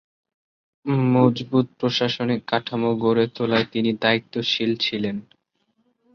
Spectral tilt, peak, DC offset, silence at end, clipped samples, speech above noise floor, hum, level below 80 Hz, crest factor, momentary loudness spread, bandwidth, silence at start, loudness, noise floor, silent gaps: -6.5 dB/octave; -4 dBFS; under 0.1%; 0.95 s; under 0.1%; 48 dB; none; -62 dBFS; 20 dB; 6 LU; 6.8 kHz; 0.85 s; -22 LUFS; -70 dBFS; none